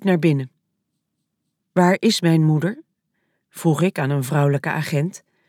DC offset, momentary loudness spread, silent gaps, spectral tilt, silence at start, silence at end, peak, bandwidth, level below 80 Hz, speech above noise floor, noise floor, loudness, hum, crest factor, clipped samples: under 0.1%; 9 LU; none; -6.5 dB/octave; 0 s; 0.3 s; -4 dBFS; 16 kHz; -74 dBFS; 58 dB; -76 dBFS; -20 LUFS; none; 18 dB; under 0.1%